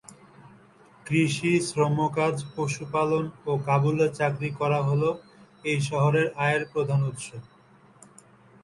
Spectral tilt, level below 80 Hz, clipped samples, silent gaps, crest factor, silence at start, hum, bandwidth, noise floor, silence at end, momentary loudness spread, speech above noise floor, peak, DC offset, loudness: -6 dB/octave; -62 dBFS; under 0.1%; none; 18 dB; 0.4 s; none; 11.5 kHz; -56 dBFS; 1.2 s; 8 LU; 31 dB; -8 dBFS; under 0.1%; -26 LUFS